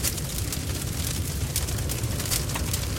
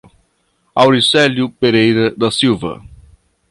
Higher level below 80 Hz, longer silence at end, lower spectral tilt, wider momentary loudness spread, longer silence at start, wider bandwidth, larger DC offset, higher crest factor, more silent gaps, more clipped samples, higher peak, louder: first, -34 dBFS vs -48 dBFS; second, 0 s vs 0.75 s; second, -3.5 dB/octave vs -5 dB/octave; second, 3 LU vs 11 LU; second, 0 s vs 0.75 s; first, 17 kHz vs 11.5 kHz; neither; first, 20 dB vs 14 dB; neither; neither; second, -8 dBFS vs 0 dBFS; second, -28 LUFS vs -13 LUFS